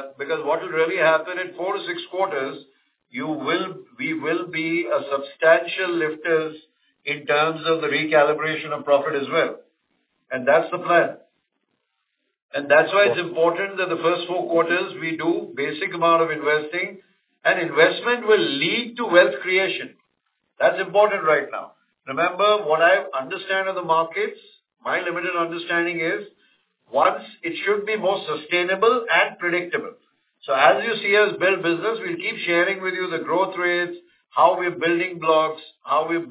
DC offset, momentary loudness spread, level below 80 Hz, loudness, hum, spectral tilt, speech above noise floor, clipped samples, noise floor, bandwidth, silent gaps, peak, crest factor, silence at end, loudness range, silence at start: under 0.1%; 11 LU; -76 dBFS; -21 LUFS; none; -8 dB/octave; 54 dB; under 0.1%; -75 dBFS; 4 kHz; 12.42-12.49 s; 0 dBFS; 22 dB; 0 s; 4 LU; 0 s